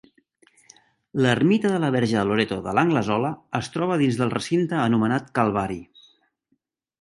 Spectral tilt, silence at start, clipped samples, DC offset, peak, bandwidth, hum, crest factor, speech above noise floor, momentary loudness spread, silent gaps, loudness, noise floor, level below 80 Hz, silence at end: -6.5 dB/octave; 1.15 s; under 0.1%; under 0.1%; -4 dBFS; 11.5 kHz; none; 20 dB; 51 dB; 8 LU; none; -22 LUFS; -72 dBFS; -56 dBFS; 1.2 s